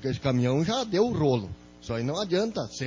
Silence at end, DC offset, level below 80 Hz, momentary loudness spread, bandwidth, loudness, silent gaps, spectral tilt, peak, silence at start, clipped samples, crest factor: 0 s; under 0.1%; -52 dBFS; 9 LU; 7.6 kHz; -27 LUFS; none; -6 dB/octave; -12 dBFS; 0 s; under 0.1%; 16 dB